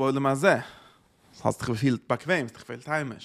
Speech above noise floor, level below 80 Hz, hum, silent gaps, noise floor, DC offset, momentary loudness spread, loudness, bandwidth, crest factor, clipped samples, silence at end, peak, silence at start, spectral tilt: 32 dB; -62 dBFS; none; none; -58 dBFS; under 0.1%; 12 LU; -27 LUFS; 14.5 kHz; 22 dB; under 0.1%; 0 s; -4 dBFS; 0 s; -6 dB/octave